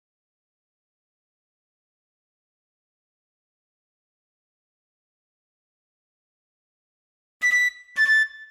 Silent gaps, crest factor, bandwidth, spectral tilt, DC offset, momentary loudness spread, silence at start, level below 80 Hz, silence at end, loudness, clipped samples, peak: none; 18 dB; 15.5 kHz; 3.5 dB/octave; under 0.1%; 6 LU; 7.4 s; -76 dBFS; 0.05 s; -20 LUFS; under 0.1%; -12 dBFS